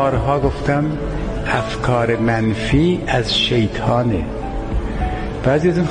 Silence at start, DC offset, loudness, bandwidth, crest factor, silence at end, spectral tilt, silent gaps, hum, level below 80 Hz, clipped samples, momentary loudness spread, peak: 0 s; under 0.1%; -18 LUFS; 10 kHz; 16 dB; 0 s; -6.5 dB/octave; none; none; -28 dBFS; under 0.1%; 8 LU; -2 dBFS